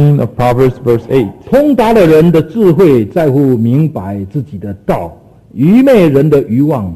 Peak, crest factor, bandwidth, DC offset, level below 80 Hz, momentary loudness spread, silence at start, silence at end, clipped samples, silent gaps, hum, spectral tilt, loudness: 0 dBFS; 10 dB; 14 kHz; under 0.1%; -36 dBFS; 13 LU; 0 s; 0 s; 0.2%; none; none; -9 dB/octave; -10 LUFS